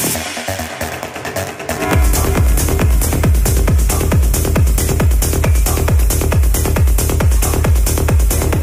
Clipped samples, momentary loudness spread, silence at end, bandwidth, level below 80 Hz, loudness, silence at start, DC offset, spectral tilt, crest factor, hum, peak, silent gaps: under 0.1%; 8 LU; 0 s; 16 kHz; -16 dBFS; -15 LUFS; 0 s; under 0.1%; -5 dB/octave; 12 dB; none; 0 dBFS; none